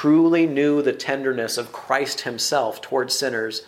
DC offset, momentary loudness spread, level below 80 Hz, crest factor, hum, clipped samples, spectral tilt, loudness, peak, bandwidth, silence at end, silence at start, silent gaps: under 0.1%; 8 LU; -70 dBFS; 16 dB; none; under 0.1%; -3.5 dB/octave; -21 LUFS; -4 dBFS; 16 kHz; 0.05 s; 0 s; none